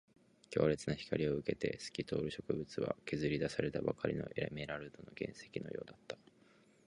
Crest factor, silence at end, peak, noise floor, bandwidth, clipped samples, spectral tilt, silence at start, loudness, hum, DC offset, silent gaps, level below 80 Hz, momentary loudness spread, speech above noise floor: 22 dB; 0.7 s; -18 dBFS; -67 dBFS; 11 kHz; under 0.1%; -6 dB/octave; 0.5 s; -40 LUFS; none; under 0.1%; none; -64 dBFS; 12 LU; 28 dB